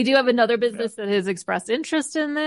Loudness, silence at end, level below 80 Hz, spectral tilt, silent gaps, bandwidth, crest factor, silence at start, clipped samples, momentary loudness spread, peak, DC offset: -22 LUFS; 0 s; -72 dBFS; -4 dB/octave; none; 11.5 kHz; 16 dB; 0 s; under 0.1%; 7 LU; -4 dBFS; under 0.1%